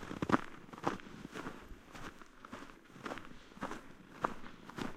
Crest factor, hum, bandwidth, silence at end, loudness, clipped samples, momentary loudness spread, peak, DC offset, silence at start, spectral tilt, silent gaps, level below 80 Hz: 32 dB; none; 15.5 kHz; 0 s; -43 LUFS; under 0.1%; 18 LU; -12 dBFS; under 0.1%; 0 s; -5.5 dB/octave; none; -58 dBFS